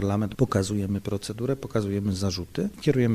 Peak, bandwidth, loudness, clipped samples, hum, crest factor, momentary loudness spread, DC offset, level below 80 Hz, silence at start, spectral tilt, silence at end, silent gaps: -8 dBFS; 15 kHz; -27 LUFS; under 0.1%; none; 18 dB; 5 LU; under 0.1%; -50 dBFS; 0 s; -6.5 dB/octave; 0 s; none